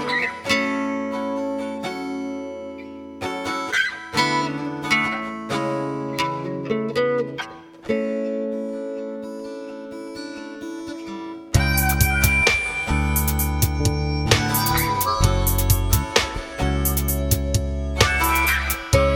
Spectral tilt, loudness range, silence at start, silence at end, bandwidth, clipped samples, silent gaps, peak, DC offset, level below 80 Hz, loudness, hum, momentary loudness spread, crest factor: -4 dB/octave; 8 LU; 0 s; 0 s; 19 kHz; under 0.1%; none; 0 dBFS; under 0.1%; -30 dBFS; -22 LUFS; none; 15 LU; 22 dB